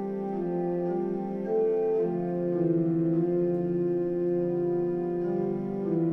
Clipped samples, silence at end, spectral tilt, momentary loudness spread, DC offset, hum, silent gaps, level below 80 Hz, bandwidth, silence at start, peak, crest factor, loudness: under 0.1%; 0 s; -12 dB/octave; 5 LU; under 0.1%; none; none; -60 dBFS; 3 kHz; 0 s; -16 dBFS; 12 dB; -28 LUFS